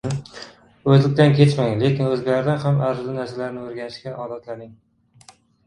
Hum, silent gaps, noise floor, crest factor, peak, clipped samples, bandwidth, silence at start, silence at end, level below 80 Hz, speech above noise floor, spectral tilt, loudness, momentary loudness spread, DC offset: none; none; -51 dBFS; 20 dB; 0 dBFS; under 0.1%; 10 kHz; 0.05 s; 0.95 s; -56 dBFS; 32 dB; -7.5 dB/octave; -19 LUFS; 19 LU; under 0.1%